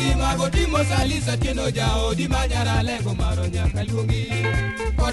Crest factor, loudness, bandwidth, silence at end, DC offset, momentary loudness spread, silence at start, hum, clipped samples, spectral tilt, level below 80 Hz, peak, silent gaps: 16 dB; -22 LUFS; 11.5 kHz; 0 s; under 0.1%; 3 LU; 0 s; none; under 0.1%; -5 dB/octave; -26 dBFS; -6 dBFS; none